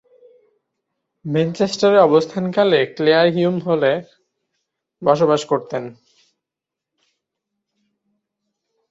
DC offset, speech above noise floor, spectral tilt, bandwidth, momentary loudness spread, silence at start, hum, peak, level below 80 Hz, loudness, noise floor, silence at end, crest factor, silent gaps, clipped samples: under 0.1%; 69 dB; -6 dB/octave; 8 kHz; 12 LU; 1.25 s; none; -2 dBFS; -64 dBFS; -17 LUFS; -85 dBFS; 3 s; 18 dB; none; under 0.1%